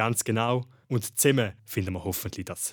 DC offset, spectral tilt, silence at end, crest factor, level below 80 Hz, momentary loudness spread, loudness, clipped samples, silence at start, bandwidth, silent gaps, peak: under 0.1%; -4.5 dB/octave; 0 s; 20 dB; -58 dBFS; 9 LU; -27 LUFS; under 0.1%; 0 s; over 20 kHz; none; -8 dBFS